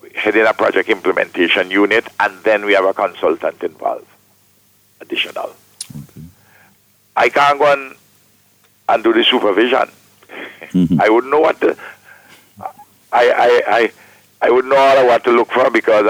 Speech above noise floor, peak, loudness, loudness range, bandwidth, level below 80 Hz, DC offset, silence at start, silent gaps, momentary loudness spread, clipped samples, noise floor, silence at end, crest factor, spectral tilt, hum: 40 dB; -2 dBFS; -14 LUFS; 8 LU; 17.5 kHz; -58 dBFS; under 0.1%; 0.15 s; none; 19 LU; under 0.1%; -54 dBFS; 0 s; 14 dB; -5 dB/octave; none